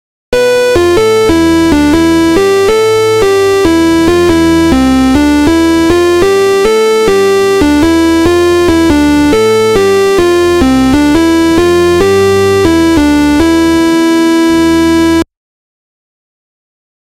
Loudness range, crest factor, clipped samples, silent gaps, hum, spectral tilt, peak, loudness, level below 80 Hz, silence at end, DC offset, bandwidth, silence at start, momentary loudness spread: 1 LU; 8 dB; under 0.1%; none; none; -5 dB/octave; 0 dBFS; -7 LUFS; -26 dBFS; 1.9 s; under 0.1%; 16 kHz; 0.3 s; 1 LU